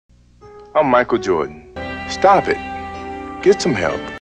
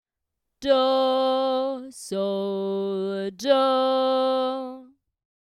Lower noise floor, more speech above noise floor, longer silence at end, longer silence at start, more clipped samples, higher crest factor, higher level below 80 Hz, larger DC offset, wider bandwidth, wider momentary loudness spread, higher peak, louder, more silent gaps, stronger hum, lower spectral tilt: second, -43 dBFS vs -82 dBFS; second, 27 dB vs 59 dB; second, 0.05 s vs 0.6 s; second, 0.45 s vs 0.6 s; neither; about the same, 18 dB vs 18 dB; first, -44 dBFS vs -66 dBFS; neither; second, 9.6 kHz vs 12.5 kHz; first, 15 LU vs 11 LU; first, -2 dBFS vs -6 dBFS; first, -17 LUFS vs -24 LUFS; neither; neither; about the same, -5 dB/octave vs -5 dB/octave